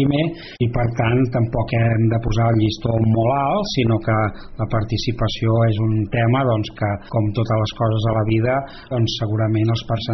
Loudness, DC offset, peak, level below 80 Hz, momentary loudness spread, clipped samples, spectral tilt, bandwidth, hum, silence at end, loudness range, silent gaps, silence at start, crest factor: -20 LUFS; under 0.1%; -6 dBFS; -38 dBFS; 5 LU; under 0.1%; -6.5 dB/octave; 6.4 kHz; none; 0 s; 2 LU; none; 0 s; 12 dB